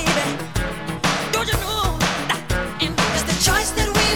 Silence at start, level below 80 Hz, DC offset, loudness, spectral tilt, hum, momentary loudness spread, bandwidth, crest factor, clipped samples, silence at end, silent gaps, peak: 0 s; -30 dBFS; under 0.1%; -20 LUFS; -3 dB/octave; none; 8 LU; over 20 kHz; 16 dB; under 0.1%; 0 s; none; -4 dBFS